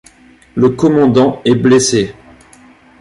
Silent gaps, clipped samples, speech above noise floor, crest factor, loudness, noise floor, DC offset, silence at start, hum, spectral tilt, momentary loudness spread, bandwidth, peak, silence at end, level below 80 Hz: none; under 0.1%; 33 dB; 12 dB; -11 LUFS; -44 dBFS; under 0.1%; 0.55 s; none; -5.5 dB/octave; 8 LU; 11.5 kHz; -2 dBFS; 0.9 s; -46 dBFS